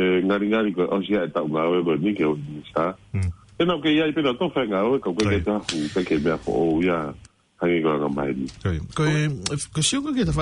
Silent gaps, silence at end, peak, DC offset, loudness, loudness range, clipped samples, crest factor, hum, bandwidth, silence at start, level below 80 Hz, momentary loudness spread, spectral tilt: none; 0 s; -8 dBFS; under 0.1%; -23 LUFS; 2 LU; under 0.1%; 14 dB; none; 11 kHz; 0 s; -46 dBFS; 7 LU; -5.5 dB/octave